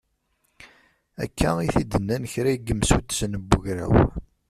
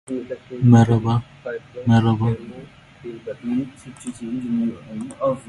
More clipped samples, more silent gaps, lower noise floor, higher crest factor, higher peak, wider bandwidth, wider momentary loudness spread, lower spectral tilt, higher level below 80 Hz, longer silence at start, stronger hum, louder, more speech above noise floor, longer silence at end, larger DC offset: neither; neither; first, -71 dBFS vs -42 dBFS; about the same, 22 dB vs 20 dB; about the same, -2 dBFS vs 0 dBFS; first, 14.5 kHz vs 11.5 kHz; second, 7 LU vs 20 LU; second, -5.5 dB/octave vs -8 dB/octave; first, -34 dBFS vs -48 dBFS; first, 0.6 s vs 0.1 s; neither; second, -24 LUFS vs -20 LUFS; first, 48 dB vs 22 dB; first, 0.3 s vs 0.1 s; neither